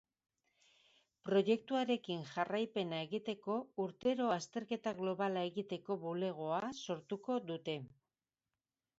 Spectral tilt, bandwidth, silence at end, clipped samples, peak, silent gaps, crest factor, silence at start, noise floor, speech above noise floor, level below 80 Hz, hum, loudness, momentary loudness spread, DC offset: -4.5 dB/octave; 7.6 kHz; 1.1 s; under 0.1%; -20 dBFS; none; 20 dB; 1.25 s; under -90 dBFS; over 52 dB; -82 dBFS; none; -39 LUFS; 8 LU; under 0.1%